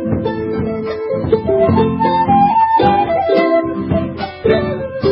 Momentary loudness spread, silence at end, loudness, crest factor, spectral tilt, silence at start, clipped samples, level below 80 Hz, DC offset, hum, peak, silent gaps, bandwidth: 8 LU; 0 s; -15 LUFS; 12 dB; -10 dB/octave; 0 s; under 0.1%; -38 dBFS; under 0.1%; none; -2 dBFS; none; 5.8 kHz